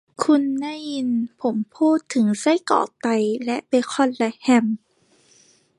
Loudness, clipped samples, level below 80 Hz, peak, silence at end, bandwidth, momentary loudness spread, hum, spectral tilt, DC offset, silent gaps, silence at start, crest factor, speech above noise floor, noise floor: -21 LUFS; under 0.1%; -74 dBFS; -2 dBFS; 1 s; 11.5 kHz; 7 LU; none; -5 dB/octave; under 0.1%; none; 0.2 s; 20 dB; 38 dB; -58 dBFS